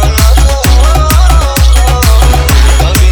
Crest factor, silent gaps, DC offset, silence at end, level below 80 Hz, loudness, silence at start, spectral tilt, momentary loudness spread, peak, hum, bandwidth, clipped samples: 4 dB; none; under 0.1%; 0 s; -6 dBFS; -7 LUFS; 0 s; -4.5 dB/octave; 1 LU; 0 dBFS; none; over 20 kHz; 2%